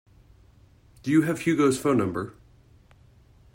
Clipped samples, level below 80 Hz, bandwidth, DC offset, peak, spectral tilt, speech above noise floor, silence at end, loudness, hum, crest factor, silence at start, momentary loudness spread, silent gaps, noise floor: under 0.1%; -58 dBFS; 16.5 kHz; under 0.1%; -10 dBFS; -6 dB/octave; 33 dB; 1.25 s; -24 LUFS; none; 18 dB; 1.05 s; 13 LU; none; -56 dBFS